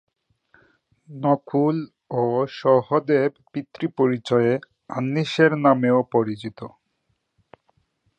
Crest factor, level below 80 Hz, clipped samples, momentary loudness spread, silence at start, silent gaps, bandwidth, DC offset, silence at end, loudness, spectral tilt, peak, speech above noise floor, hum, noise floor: 20 dB; -68 dBFS; under 0.1%; 14 LU; 1.1 s; none; 9 kHz; under 0.1%; 1.5 s; -21 LUFS; -7.5 dB/octave; -2 dBFS; 51 dB; none; -72 dBFS